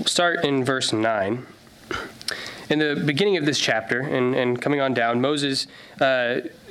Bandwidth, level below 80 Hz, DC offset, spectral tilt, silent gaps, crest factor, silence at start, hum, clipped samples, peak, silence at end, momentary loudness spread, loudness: 15 kHz; -60 dBFS; under 0.1%; -4 dB/octave; none; 16 dB; 0 s; none; under 0.1%; -6 dBFS; 0 s; 10 LU; -22 LUFS